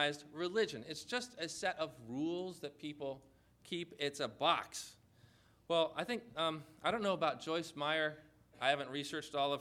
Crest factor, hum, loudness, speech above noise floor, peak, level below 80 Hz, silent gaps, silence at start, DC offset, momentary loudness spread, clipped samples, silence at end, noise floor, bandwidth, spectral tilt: 22 dB; none; -39 LUFS; 28 dB; -16 dBFS; -76 dBFS; none; 0 s; under 0.1%; 11 LU; under 0.1%; 0 s; -67 dBFS; 16 kHz; -3.5 dB/octave